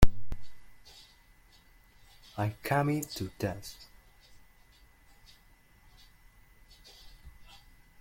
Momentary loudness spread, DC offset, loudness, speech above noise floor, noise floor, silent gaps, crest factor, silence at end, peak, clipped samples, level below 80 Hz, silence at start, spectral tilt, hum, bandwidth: 29 LU; under 0.1%; -34 LUFS; 28 dB; -61 dBFS; none; 26 dB; 0.7 s; -4 dBFS; under 0.1%; -42 dBFS; 0 s; -6 dB/octave; none; 16.5 kHz